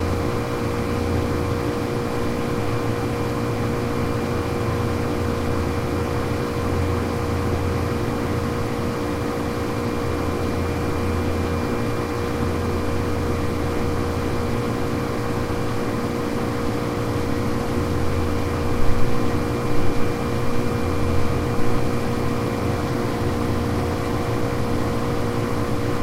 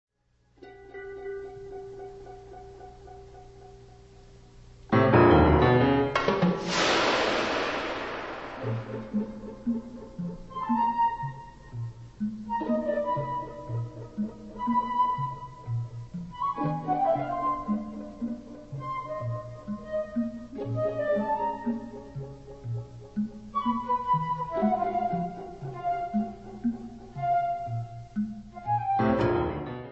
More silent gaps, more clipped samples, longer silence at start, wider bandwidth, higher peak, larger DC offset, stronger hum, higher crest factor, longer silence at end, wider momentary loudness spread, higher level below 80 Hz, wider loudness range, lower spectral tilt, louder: neither; neither; second, 0 s vs 0.6 s; first, 16 kHz vs 8.2 kHz; about the same, -4 dBFS vs -6 dBFS; second, under 0.1% vs 0.1%; second, none vs 60 Hz at -55 dBFS; second, 18 dB vs 24 dB; about the same, 0 s vs 0 s; second, 1 LU vs 17 LU; first, -32 dBFS vs -46 dBFS; second, 1 LU vs 10 LU; about the same, -6.5 dB/octave vs -6.5 dB/octave; first, -24 LUFS vs -28 LUFS